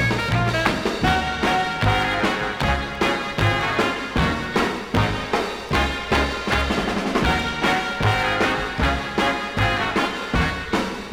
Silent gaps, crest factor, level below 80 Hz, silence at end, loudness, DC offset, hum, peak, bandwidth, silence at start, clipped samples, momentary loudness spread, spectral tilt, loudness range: none; 18 dB; -32 dBFS; 0 s; -21 LUFS; under 0.1%; none; -4 dBFS; 17.5 kHz; 0 s; under 0.1%; 3 LU; -5 dB/octave; 1 LU